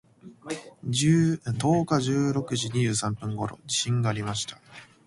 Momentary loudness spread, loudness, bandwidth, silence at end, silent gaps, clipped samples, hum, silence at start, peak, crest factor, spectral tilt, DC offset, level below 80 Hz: 14 LU; -26 LUFS; 11.5 kHz; 0.2 s; none; under 0.1%; none; 0.25 s; -10 dBFS; 16 dB; -5 dB/octave; under 0.1%; -58 dBFS